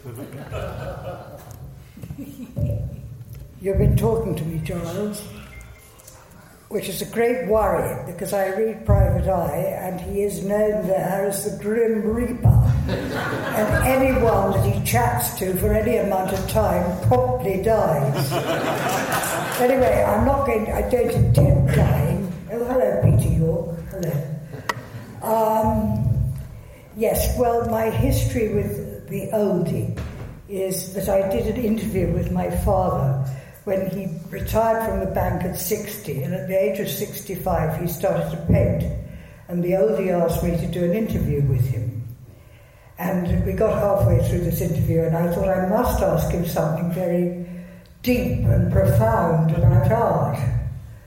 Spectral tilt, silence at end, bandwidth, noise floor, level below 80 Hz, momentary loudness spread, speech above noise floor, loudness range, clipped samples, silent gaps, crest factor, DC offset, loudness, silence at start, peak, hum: -6.5 dB/octave; 0.05 s; 17 kHz; -47 dBFS; -34 dBFS; 14 LU; 27 dB; 5 LU; under 0.1%; none; 18 dB; under 0.1%; -21 LUFS; 0.05 s; -2 dBFS; none